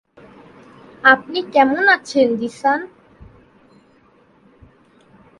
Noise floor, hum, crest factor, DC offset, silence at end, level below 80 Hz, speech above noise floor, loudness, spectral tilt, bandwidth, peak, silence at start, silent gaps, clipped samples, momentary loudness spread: -53 dBFS; none; 20 dB; under 0.1%; 2.55 s; -58 dBFS; 38 dB; -16 LUFS; -4 dB/octave; 11.5 kHz; 0 dBFS; 1.05 s; none; under 0.1%; 7 LU